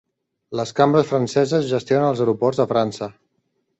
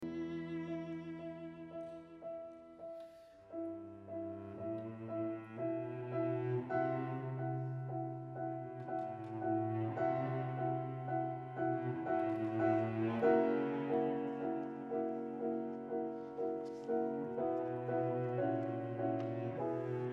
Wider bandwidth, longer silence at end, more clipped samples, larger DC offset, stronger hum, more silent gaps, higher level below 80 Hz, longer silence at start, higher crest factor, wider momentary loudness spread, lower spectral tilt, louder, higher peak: first, 8.2 kHz vs 6 kHz; first, 0.7 s vs 0 s; neither; neither; neither; neither; first, -60 dBFS vs -78 dBFS; first, 0.5 s vs 0 s; about the same, 18 dB vs 18 dB; about the same, 11 LU vs 12 LU; second, -6.5 dB/octave vs -10 dB/octave; first, -19 LUFS vs -39 LUFS; first, -2 dBFS vs -20 dBFS